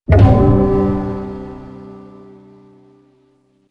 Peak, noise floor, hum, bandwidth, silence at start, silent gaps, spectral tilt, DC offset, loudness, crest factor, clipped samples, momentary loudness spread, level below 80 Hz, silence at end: 0 dBFS; -57 dBFS; none; 5.2 kHz; 0.1 s; none; -10.5 dB/octave; under 0.1%; -13 LUFS; 16 dB; under 0.1%; 26 LU; -26 dBFS; 1.7 s